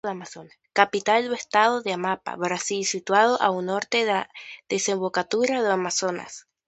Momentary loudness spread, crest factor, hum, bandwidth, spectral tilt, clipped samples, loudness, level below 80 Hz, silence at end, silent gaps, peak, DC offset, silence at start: 12 LU; 22 dB; none; 8.8 kHz; -2.5 dB/octave; under 0.1%; -23 LUFS; -72 dBFS; 0.3 s; none; -2 dBFS; under 0.1%; 0.05 s